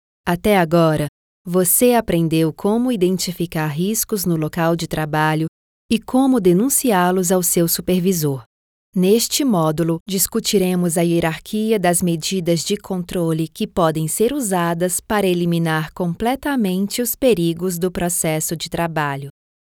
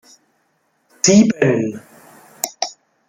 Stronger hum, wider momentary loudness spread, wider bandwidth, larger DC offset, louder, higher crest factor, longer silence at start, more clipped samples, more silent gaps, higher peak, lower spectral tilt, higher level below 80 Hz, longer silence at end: neither; second, 7 LU vs 14 LU; first, 19.5 kHz vs 16 kHz; neither; about the same, -18 LUFS vs -16 LUFS; about the same, 16 dB vs 18 dB; second, 0.25 s vs 1.05 s; neither; first, 1.09-1.45 s, 5.48-5.89 s, 8.46-8.93 s, 10.00-10.06 s vs none; about the same, -2 dBFS vs 0 dBFS; about the same, -4.5 dB/octave vs -4.5 dB/octave; first, -46 dBFS vs -60 dBFS; about the same, 0.5 s vs 0.4 s